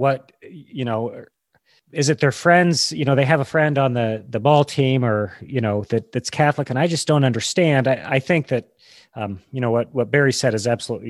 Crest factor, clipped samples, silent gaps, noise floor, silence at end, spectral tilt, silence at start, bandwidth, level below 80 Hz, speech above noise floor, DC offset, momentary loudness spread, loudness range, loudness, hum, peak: 18 dB; under 0.1%; none; -62 dBFS; 0 s; -5.5 dB/octave; 0 s; 12.5 kHz; -56 dBFS; 42 dB; under 0.1%; 10 LU; 3 LU; -19 LUFS; none; -2 dBFS